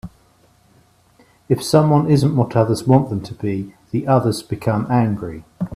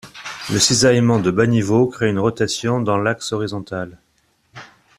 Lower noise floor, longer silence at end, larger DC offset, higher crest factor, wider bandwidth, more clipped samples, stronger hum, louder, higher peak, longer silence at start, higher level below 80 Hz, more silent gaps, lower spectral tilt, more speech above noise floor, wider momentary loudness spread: second, -55 dBFS vs -62 dBFS; second, 0 s vs 0.35 s; neither; about the same, 18 dB vs 16 dB; about the same, 14.5 kHz vs 14 kHz; neither; neither; about the same, -18 LUFS vs -17 LUFS; about the same, 0 dBFS vs -2 dBFS; about the same, 0.05 s vs 0.05 s; about the same, -50 dBFS vs -52 dBFS; neither; first, -7.5 dB/octave vs -4.5 dB/octave; second, 38 dB vs 44 dB; second, 11 LU vs 15 LU